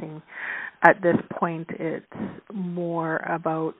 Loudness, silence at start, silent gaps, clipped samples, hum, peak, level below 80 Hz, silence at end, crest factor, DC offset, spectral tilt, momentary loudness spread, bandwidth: -25 LUFS; 0 s; none; under 0.1%; none; 0 dBFS; -68 dBFS; 0.05 s; 26 dB; under 0.1%; -6 dB/octave; 16 LU; 4.2 kHz